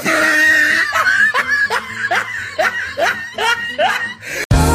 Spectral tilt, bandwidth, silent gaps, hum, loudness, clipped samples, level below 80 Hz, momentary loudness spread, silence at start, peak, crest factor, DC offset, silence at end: -3.5 dB/octave; 15.5 kHz; 4.45-4.50 s; none; -14 LUFS; under 0.1%; -30 dBFS; 9 LU; 0 s; -2 dBFS; 14 dB; under 0.1%; 0 s